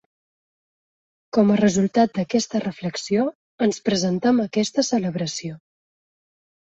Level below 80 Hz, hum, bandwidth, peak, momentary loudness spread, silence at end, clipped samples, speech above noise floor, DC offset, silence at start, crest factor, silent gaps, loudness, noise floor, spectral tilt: -62 dBFS; none; 8.2 kHz; -6 dBFS; 9 LU; 1.15 s; under 0.1%; over 69 dB; under 0.1%; 1.35 s; 18 dB; 3.35-3.58 s; -22 LUFS; under -90 dBFS; -5 dB/octave